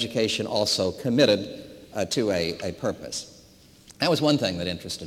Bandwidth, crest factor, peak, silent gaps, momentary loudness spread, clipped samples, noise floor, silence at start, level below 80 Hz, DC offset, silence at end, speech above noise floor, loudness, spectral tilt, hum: 16.5 kHz; 20 dB; -6 dBFS; none; 13 LU; under 0.1%; -53 dBFS; 0 s; -60 dBFS; under 0.1%; 0 s; 28 dB; -25 LUFS; -4.5 dB/octave; none